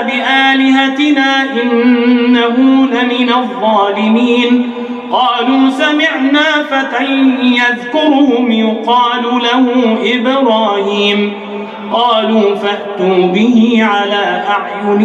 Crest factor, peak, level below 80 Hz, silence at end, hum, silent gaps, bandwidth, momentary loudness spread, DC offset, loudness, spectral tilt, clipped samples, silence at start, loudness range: 10 dB; 0 dBFS; -62 dBFS; 0 s; none; none; 8.2 kHz; 5 LU; under 0.1%; -11 LUFS; -5 dB/octave; under 0.1%; 0 s; 2 LU